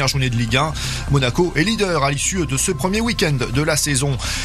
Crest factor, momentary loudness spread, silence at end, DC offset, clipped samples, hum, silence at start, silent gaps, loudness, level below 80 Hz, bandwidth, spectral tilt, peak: 16 dB; 3 LU; 0 s; under 0.1%; under 0.1%; none; 0 s; none; -18 LUFS; -32 dBFS; 14 kHz; -4 dB/octave; -2 dBFS